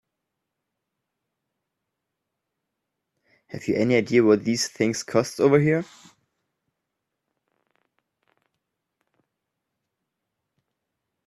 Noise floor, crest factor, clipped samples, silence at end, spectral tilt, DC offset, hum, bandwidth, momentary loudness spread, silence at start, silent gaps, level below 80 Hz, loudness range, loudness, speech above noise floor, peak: -82 dBFS; 22 dB; under 0.1%; 5.45 s; -5.5 dB/octave; under 0.1%; none; 13 kHz; 11 LU; 3.55 s; none; -66 dBFS; 8 LU; -22 LUFS; 61 dB; -6 dBFS